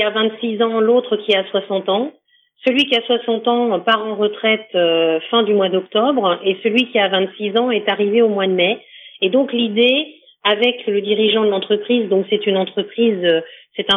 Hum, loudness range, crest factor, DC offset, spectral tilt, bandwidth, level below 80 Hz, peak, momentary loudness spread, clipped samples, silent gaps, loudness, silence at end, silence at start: none; 1 LU; 16 dB; under 0.1%; -6 dB/octave; 6.4 kHz; -74 dBFS; -2 dBFS; 5 LU; under 0.1%; none; -17 LUFS; 0 s; 0 s